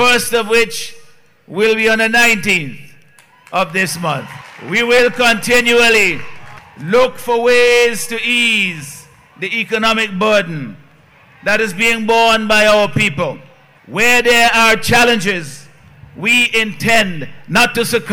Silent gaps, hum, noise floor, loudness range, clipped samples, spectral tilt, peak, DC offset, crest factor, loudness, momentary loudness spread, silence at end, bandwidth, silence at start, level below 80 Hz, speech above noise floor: none; none; -47 dBFS; 4 LU; under 0.1%; -3 dB/octave; -4 dBFS; under 0.1%; 10 dB; -12 LUFS; 16 LU; 0 s; 18 kHz; 0 s; -44 dBFS; 34 dB